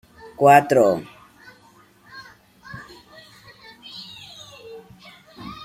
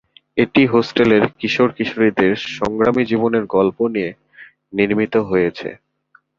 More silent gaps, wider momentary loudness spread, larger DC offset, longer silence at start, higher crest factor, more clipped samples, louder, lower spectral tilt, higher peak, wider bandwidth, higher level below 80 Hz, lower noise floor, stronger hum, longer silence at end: neither; first, 29 LU vs 9 LU; neither; about the same, 0.4 s vs 0.35 s; first, 22 dB vs 16 dB; neither; about the same, -16 LUFS vs -17 LUFS; second, -5.5 dB/octave vs -7 dB/octave; about the same, -2 dBFS vs 0 dBFS; first, 16.5 kHz vs 7.4 kHz; second, -62 dBFS vs -52 dBFS; about the same, -53 dBFS vs -56 dBFS; neither; second, 0.1 s vs 0.65 s